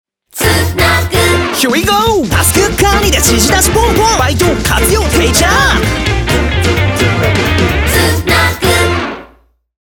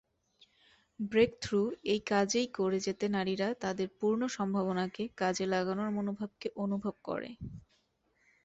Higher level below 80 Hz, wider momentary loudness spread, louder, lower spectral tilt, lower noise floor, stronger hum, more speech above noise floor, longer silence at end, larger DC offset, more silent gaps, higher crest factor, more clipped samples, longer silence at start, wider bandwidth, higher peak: first, -20 dBFS vs -64 dBFS; second, 4 LU vs 10 LU; first, -10 LUFS vs -33 LUFS; second, -3.5 dB/octave vs -5 dB/octave; second, -46 dBFS vs -74 dBFS; neither; second, 37 dB vs 41 dB; second, 0.55 s vs 0.85 s; neither; neither; second, 10 dB vs 20 dB; neither; second, 0.35 s vs 1 s; first, over 20 kHz vs 8.2 kHz; first, 0 dBFS vs -14 dBFS